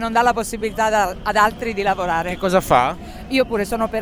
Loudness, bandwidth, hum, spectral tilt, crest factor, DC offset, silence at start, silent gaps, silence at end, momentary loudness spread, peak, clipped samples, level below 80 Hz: -19 LUFS; over 20 kHz; none; -4.5 dB/octave; 18 dB; under 0.1%; 0 s; none; 0 s; 6 LU; -2 dBFS; under 0.1%; -38 dBFS